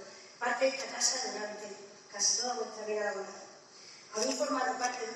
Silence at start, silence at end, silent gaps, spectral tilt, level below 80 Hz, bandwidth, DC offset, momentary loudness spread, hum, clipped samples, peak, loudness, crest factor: 0 s; 0 s; none; 0 dB/octave; under -90 dBFS; 13.5 kHz; under 0.1%; 20 LU; none; under 0.1%; -14 dBFS; -32 LUFS; 22 dB